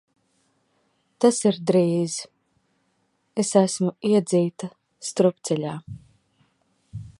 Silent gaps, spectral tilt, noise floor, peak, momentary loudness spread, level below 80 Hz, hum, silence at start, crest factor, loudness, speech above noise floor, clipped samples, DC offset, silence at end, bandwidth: none; -5.5 dB/octave; -70 dBFS; -4 dBFS; 19 LU; -62 dBFS; none; 1.2 s; 22 dB; -23 LUFS; 48 dB; under 0.1%; under 0.1%; 0.1 s; 11.5 kHz